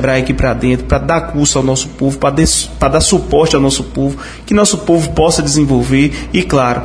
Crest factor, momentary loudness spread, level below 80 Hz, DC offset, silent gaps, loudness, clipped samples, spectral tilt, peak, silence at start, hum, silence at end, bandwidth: 12 dB; 5 LU; -24 dBFS; under 0.1%; none; -12 LUFS; under 0.1%; -4.5 dB/octave; 0 dBFS; 0 s; none; 0 s; 11 kHz